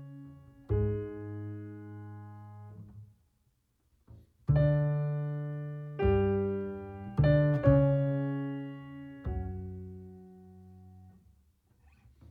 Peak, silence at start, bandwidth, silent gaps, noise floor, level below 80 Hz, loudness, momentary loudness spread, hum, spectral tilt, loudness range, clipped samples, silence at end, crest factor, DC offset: -12 dBFS; 0 s; 4.5 kHz; none; -74 dBFS; -46 dBFS; -31 LUFS; 24 LU; none; -11 dB/octave; 16 LU; under 0.1%; 1.2 s; 22 dB; under 0.1%